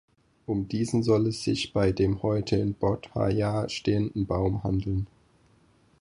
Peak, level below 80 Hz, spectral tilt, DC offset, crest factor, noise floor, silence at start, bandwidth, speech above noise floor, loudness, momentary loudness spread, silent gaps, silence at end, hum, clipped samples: -10 dBFS; -44 dBFS; -7 dB/octave; under 0.1%; 18 dB; -62 dBFS; 0.5 s; 11 kHz; 36 dB; -27 LUFS; 7 LU; none; 0.95 s; none; under 0.1%